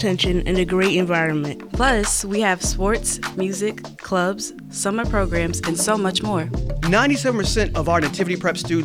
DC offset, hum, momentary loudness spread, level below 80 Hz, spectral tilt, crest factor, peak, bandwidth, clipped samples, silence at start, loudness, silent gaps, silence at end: under 0.1%; none; 7 LU; -30 dBFS; -4 dB/octave; 18 dB; -4 dBFS; 17 kHz; under 0.1%; 0 s; -20 LUFS; none; 0 s